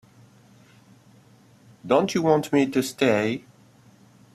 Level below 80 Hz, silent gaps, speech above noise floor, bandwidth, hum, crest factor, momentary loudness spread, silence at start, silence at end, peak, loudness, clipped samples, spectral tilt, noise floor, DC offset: -64 dBFS; none; 33 dB; 14 kHz; none; 20 dB; 9 LU; 1.85 s; 0.95 s; -6 dBFS; -22 LUFS; under 0.1%; -5.5 dB/octave; -54 dBFS; under 0.1%